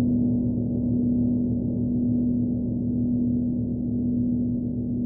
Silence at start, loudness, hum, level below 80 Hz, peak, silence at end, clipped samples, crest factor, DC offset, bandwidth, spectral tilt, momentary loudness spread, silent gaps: 0 s; -25 LUFS; 50 Hz at -45 dBFS; -40 dBFS; -14 dBFS; 0 s; under 0.1%; 10 dB; under 0.1%; 1 kHz; -19 dB/octave; 3 LU; none